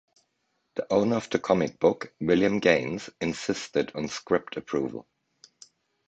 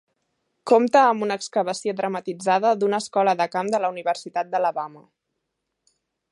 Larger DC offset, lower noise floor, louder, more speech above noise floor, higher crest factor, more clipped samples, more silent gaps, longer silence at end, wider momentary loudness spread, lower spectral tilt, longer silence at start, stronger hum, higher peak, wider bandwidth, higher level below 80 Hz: neither; about the same, -76 dBFS vs -79 dBFS; second, -27 LUFS vs -22 LUFS; second, 50 dB vs 57 dB; about the same, 22 dB vs 20 dB; neither; neither; second, 1.05 s vs 1.35 s; about the same, 11 LU vs 10 LU; about the same, -5.5 dB/octave vs -4.5 dB/octave; about the same, 0.75 s vs 0.65 s; neither; about the same, -6 dBFS vs -4 dBFS; second, 8.8 kHz vs 11.5 kHz; first, -60 dBFS vs -78 dBFS